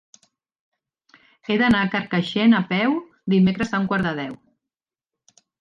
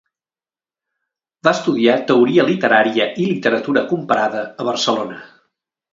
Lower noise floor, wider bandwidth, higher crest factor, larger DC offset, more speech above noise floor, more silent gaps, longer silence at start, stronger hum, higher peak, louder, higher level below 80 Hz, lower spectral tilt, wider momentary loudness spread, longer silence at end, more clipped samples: about the same, -88 dBFS vs under -90 dBFS; about the same, 7.4 kHz vs 7.6 kHz; about the same, 16 dB vs 18 dB; neither; second, 69 dB vs over 74 dB; neither; about the same, 1.5 s vs 1.45 s; neither; second, -6 dBFS vs 0 dBFS; second, -21 LUFS vs -16 LUFS; first, -54 dBFS vs -64 dBFS; first, -7 dB/octave vs -5 dB/octave; about the same, 10 LU vs 8 LU; first, 1.25 s vs 0.65 s; neither